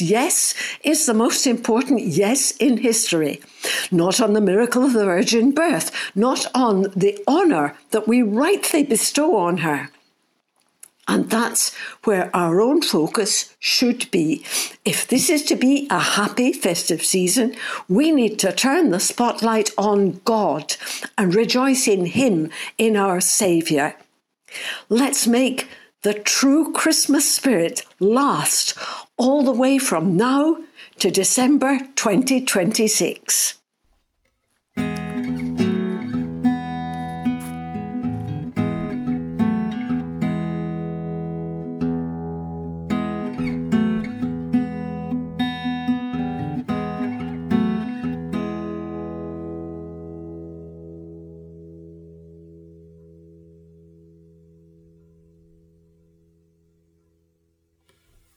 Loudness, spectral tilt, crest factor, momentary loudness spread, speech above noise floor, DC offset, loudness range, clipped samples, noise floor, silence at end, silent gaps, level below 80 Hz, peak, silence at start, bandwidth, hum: -20 LUFS; -3.5 dB/octave; 18 dB; 12 LU; 51 dB; under 0.1%; 8 LU; under 0.1%; -69 dBFS; 5.75 s; none; -54 dBFS; -4 dBFS; 0 s; 15.5 kHz; none